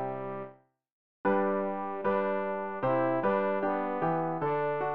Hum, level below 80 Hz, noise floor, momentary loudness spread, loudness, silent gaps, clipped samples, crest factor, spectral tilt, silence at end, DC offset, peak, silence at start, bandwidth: none; -66 dBFS; -54 dBFS; 8 LU; -30 LUFS; 0.92-1.24 s; under 0.1%; 16 dB; -6 dB/octave; 0 s; 0.3%; -14 dBFS; 0 s; 5 kHz